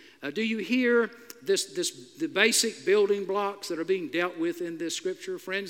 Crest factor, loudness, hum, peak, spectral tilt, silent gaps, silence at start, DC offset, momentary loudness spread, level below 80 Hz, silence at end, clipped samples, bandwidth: 22 dB; -27 LUFS; none; -6 dBFS; -2.5 dB/octave; none; 0.2 s; under 0.1%; 11 LU; -86 dBFS; 0 s; under 0.1%; 17 kHz